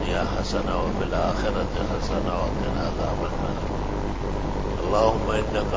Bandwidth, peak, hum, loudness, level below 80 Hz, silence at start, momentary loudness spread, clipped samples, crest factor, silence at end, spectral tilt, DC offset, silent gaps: 7.8 kHz; -6 dBFS; none; -26 LUFS; -30 dBFS; 0 s; 7 LU; under 0.1%; 18 dB; 0 s; -6.5 dB/octave; under 0.1%; none